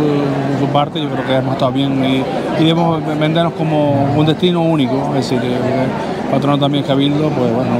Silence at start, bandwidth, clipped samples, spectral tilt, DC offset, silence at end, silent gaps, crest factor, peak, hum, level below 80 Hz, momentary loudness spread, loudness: 0 s; 13 kHz; under 0.1%; -7.5 dB/octave; under 0.1%; 0 s; none; 14 dB; 0 dBFS; none; -46 dBFS; 3 LU; -15 LUFS